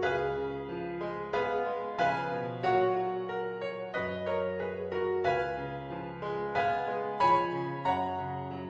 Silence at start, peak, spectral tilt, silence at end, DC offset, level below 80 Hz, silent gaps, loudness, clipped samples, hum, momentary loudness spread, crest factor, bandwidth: 0 s; -14 dBFS; -7 dB/octave; 0 s; under 0.1%; -60 dBFS; none; -32 LUFS; under 0.1%; none; 9 LU; 18 dB; 7.8 kHz